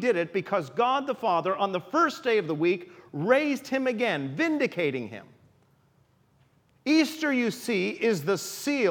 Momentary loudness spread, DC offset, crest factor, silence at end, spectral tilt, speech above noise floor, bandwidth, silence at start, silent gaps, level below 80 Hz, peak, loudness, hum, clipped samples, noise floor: 6 LU; under 0.1%; 20 dB; 0 s; -5 dB/octave; 38 dB; 19 kHz; 0 s; none; -78 dBFS; -8 dBFS; -27 LUFS; none; under 0.1%; -64 dBFS